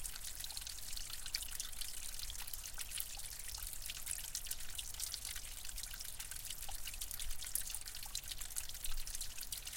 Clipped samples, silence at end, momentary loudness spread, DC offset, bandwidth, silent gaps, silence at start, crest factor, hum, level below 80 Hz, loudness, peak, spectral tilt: under 0.1%; 0 s; 4 LU; under 0.1%; 17 kHz; none; 0 s; 24 dB; none; -50 dBFS; -44 LUFS; -18 dBFS; 0.5 dB/octave